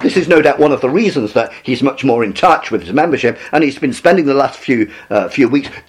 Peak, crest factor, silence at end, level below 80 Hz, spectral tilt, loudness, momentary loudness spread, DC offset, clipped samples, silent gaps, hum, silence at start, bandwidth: 0 dBFS; 12 dB; 0.1 s; -50 dBFS; -6 dB/octave; -13 LUFS; 6 LU; under 0.1%; under 0.1%; none; none; 0 s; 12 kHz